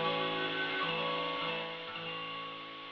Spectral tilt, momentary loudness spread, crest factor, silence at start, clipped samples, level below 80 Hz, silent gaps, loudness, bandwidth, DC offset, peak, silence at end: -1 dB/octave; 8 LU; 16 dB; 0 s; under 0.1%; -76 dBFS; none; -35 LUFS; 6.8 kHz; under 0.1%; -20 dBFS; 0 s